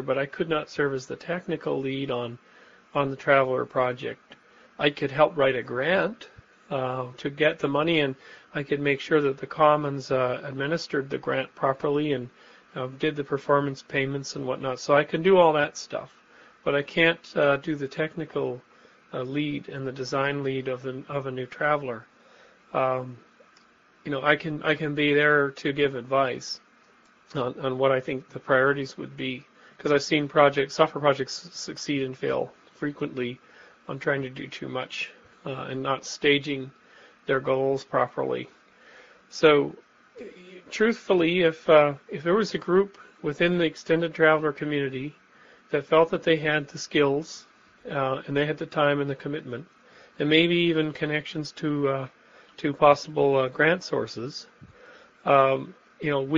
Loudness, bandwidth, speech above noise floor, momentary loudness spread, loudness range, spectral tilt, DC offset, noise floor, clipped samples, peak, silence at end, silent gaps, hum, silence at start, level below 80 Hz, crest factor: -25 LUFS; 7.6 kHz; 33 dB; 15 LU; 6 LU; -3.5 dB/octave; under 0.1%; -59 dBFS; under 0.1%; -4 dBFS; 0 s; none; none; 0 s; -64 dBFS; 22 dB